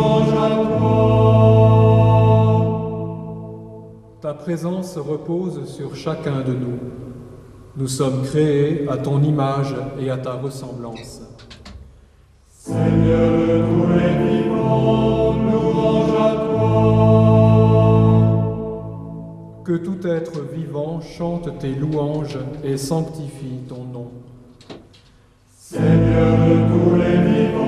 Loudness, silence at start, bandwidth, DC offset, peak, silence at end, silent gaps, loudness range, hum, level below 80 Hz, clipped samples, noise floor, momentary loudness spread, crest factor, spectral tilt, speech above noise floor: -17 LUFS; 0 s; 11 kHz; under 0.1%; -2 dBFS; 0 s; none; 11 LU; none; -38 dBFS; under 0.1%; -52 dBFS; 19 LU; 16 dB; -8.5 dB/octave; 33 dB